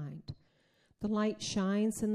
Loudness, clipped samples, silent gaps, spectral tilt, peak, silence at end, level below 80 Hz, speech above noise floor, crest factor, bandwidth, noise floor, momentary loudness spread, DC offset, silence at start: -34 LUFS; under 0.1%; none; -5.5 dB/octave; -22 dBFS; 0 s; -64 dBFS; 39 dB; 12 dB; 14.5 kHz; -71 dBFS; 18 LU; under 0.1%; 0 s